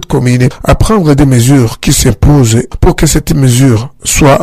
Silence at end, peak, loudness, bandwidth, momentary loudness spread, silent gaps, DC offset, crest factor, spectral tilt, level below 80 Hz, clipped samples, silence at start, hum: 0 s; 0 dBFS; -8 LUFS; 16 kHz; 4 LU; none; under 0.1%; 6 dB; -5.5 dB/octave; -18 dBFS; 0.4%; 0 s; none